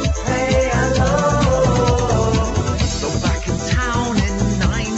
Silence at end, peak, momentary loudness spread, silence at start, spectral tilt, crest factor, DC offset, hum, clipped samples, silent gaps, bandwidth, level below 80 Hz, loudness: 0 s; -4 dBFS; 4 LU; 0 s; -5.5 dB/octave; 14 dB; under 0.1%; none; under 0.1%; none; 8.2 kHz; -24 dBFS; -18 LUFS